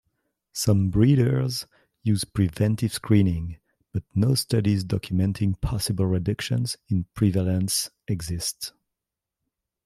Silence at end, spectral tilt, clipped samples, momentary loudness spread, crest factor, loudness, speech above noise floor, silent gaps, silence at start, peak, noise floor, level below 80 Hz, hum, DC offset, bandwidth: 1.15 s; -6 dB/octave; under 0.1%; 11 LU; 18 dB; -24 LUFS; 63 dB; none; 0.55 s; -6 dBFS; -86 dBFS; -46 dBFS; none; under 0.1%; 15 kHz